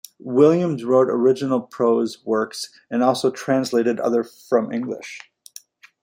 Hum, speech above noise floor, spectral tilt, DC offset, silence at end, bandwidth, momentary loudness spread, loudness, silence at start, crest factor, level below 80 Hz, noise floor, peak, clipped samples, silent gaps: none; 26 dB; -6 dB/octave; under 0.1%; 0.85 s; 16.5 kHz; 13 LU; -20 LUFS; 0.25 s; 18 dB; -68 dBFS; -46 dBFS; -2 dBFS; under 0.1%; none